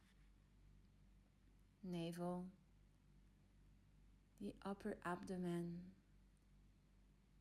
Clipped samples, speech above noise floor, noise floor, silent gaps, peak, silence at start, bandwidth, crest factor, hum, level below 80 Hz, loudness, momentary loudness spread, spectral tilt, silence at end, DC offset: under 0.1%; 24 dB; -72 dBFS; none; -34 dBFS; 0 s; 13.5 kHz; 20 dB; none; -72 dBFS; -50 LUFS; 11 LU; -7 dB/octave; 0 s; under 0.1%